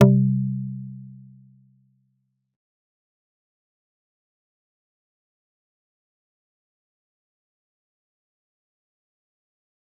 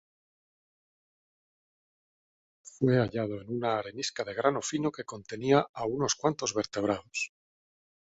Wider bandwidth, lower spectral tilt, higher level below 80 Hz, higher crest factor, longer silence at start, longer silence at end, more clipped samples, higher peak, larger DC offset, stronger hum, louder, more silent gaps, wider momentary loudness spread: second, 3.4 kHz vs 8.4 kHz; first, -10 dB/octave vs -4.5 dB/octave; second, -72 dBFS vs -66 dBFS; about the same, 28 dB vs 24 dB; second, 0 s vs 2.65 s; first, 8.9 s vs 0.85 s; neither; first, -2 dBFS vs -10 dBFS; neither; neither; first, -23 LUFS vs -30 LUFS; second, none vs 5.69-5.74 s; first, 23 LU vs 9 LU